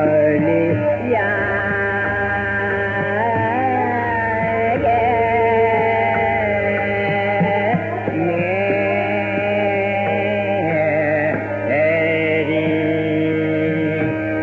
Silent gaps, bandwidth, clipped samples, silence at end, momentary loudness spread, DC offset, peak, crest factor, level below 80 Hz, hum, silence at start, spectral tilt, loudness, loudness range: none; 7 kHz; under 0.1%; 0 s; 3 LU; under 0.1%; -4 dBFS; 12 dB; -48 dBFS; none; 0 s; -5 dB/octave; -18 LUFS; 2 LU